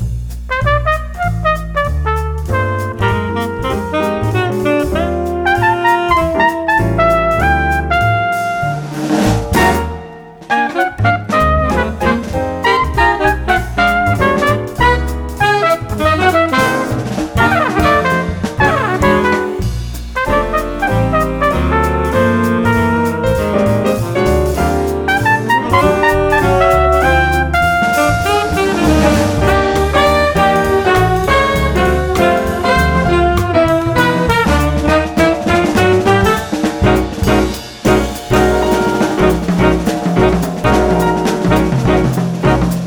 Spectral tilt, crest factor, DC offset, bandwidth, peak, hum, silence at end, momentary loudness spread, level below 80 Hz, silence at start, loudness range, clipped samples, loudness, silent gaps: -6 dB/octave; 12 dB; under 0.1%; over 20 kHz; 0 dBFS; none; 0 s; 6 LU; -24 dBFS; 0 s; 3 LU; under 0.1%; -13 LUFS; none